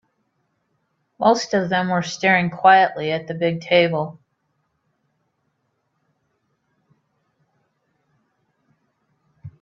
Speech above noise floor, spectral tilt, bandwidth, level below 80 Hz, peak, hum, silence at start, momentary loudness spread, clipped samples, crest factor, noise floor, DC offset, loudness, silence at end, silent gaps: 53 dB; -5 dB/octave; 7.6 kHz; -66 dBFS; -2 dBFS; none; 1.2 s; 11 LU; under 0.1%; 22 dB; -71 dBFS; under 0.1%; -18 LUFS; 0.1 s; none